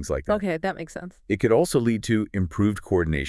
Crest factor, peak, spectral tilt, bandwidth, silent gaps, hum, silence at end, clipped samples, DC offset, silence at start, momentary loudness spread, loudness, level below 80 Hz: 16 dB; -8 dBFS; -6.5 dB/octave; 12 kHz; none; none; 0 s; under 0.1%; under 0.1%; 0 s; 10 LU; -24 LUFS; -42 dBFS